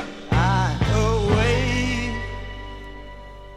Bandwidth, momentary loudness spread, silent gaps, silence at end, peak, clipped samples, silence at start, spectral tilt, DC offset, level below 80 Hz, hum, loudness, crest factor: 12 kHz; 19 LU; none; 0 s; -4 dBFS; under 0.1%; 0 s; -6 dB/octave; under 0.1%; -30 dBFS; none; -22 LUFS; 18 dB